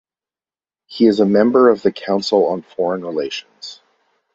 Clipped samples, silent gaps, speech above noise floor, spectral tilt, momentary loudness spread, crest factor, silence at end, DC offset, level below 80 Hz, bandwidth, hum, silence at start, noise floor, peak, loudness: under 0.1%; none; over 74 dB; -6 dB/octave; 21 LU; 16 dB; 0.6 s; under 0.1%; -60 dBFS; 8 kHz; none; 0.9 s; under -90 dBFS; -2 dBFS; -16 LUFS